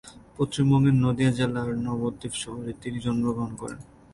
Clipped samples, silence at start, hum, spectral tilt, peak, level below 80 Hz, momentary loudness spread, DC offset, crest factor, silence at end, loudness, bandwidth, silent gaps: under 0.1%; 0.05 s; none; -6.5 dB/octave; -10 dBFS; -50 dBFS; 15 LU; under 0.1%; 14 dB; 0.3 s; -26 LUFS; 11.5 kHz; none